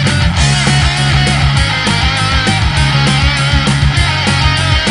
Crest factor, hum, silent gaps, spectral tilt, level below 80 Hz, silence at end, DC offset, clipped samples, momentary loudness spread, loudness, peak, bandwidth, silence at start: 10 dB; none; none; -4 dB/octave; -18 dBFS; 0 s; under 0.1%; under 0.1%; 1 LU; -11 LUFS; 0 dBFS; 11 kHz; 0 s